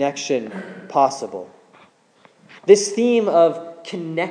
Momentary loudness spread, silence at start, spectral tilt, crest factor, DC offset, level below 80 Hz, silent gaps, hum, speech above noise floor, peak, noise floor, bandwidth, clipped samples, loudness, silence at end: 18 LU; 0 s; -4 dB/octave; 20 dB; under 0.1%; -82 dBFS; none; none; 36 dB; 0 dBFS; -55 dBFS; 10.5 kHz; under 0.1%; -18 LUFS; 0 s